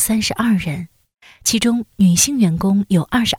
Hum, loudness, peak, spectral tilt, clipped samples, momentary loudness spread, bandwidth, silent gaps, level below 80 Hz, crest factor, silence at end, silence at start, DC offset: none; -16 LUFS; -2 dBFS; -4 dB/octave; under 0.1%; 9 LU; 17.5 kHz; none; -44 dBFS; 16 dB; 0 s; 0 s; under 0.1%